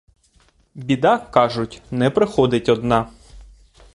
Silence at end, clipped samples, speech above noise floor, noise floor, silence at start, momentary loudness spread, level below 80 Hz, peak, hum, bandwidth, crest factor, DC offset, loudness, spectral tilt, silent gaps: 0.5 s; under 0.1%; 39 dB; -57 dBFS; 0.75 s; 10 LU; -46 dBFS; -2 dBFS; none; 11.5 kHz; 20 dB; under 0.1%; -19 LUFS; -6.5 dB/octave; none